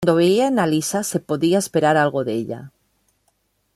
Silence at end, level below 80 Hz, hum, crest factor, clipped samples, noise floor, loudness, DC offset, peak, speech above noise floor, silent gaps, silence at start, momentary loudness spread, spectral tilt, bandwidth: 1.05 s; -60 dBFS; none; 16 dB; under 0.1%; -67 dBFS; -19 LUFS; under 0.1%; -4 dBFS; 48 dB; none; 0 s; 10 LU; -5 dB/octave; 14 kHz